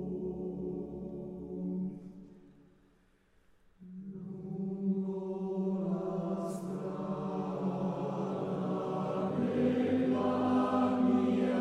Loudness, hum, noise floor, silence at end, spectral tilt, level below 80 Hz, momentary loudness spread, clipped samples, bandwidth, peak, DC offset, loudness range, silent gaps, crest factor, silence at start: -34 LUFS; none; -68 dBFS; 0 s; -8.5 dB/octave; -66 dBFS; 14 LU; under 0.1%; 10.5 kHz; -18 dBFS; under 0.1%; 13 LU; none; 16 dB; 0 s